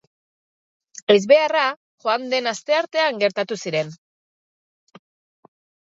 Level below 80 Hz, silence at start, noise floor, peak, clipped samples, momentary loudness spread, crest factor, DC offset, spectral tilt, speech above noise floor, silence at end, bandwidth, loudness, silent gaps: -76 dBFS; 1.1 s; under -90 dBFS; -2 dBFS; under 0.1%; 11 LU; 22 dB; under 0.1%; -3.5 dB/octave; over 71 dB; 1.9 s; 7.8 kHz; -20 LUFS; 1.76-1.98 s